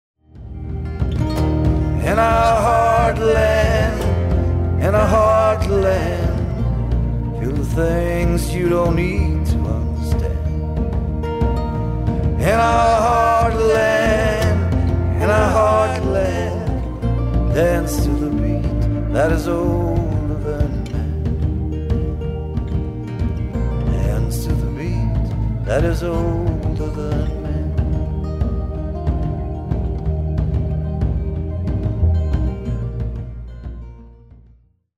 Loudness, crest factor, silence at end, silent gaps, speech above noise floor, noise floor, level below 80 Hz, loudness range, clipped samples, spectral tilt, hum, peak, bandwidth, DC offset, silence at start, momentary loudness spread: -19 LUFS; 12 dB; 0.85 s; none; 35 dB; -52 dBFS; -24 dBFS; 7 LU; under 0.1%; -7 dB/octave; none; -4 dBFS; 14.5 kHz; under 0.1%; 0.35 s; 9 LU